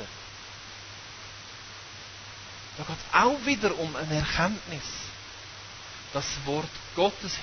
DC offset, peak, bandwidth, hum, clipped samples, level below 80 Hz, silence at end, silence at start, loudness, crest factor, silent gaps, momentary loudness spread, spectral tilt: under 0.1%; -6 dBFS; 6.6 kHz; none; under 0.1%; -50 dBFS; 0 s; 0 s; -28 LUFS; 26 dB; none; 17 LU; -4 dB/octave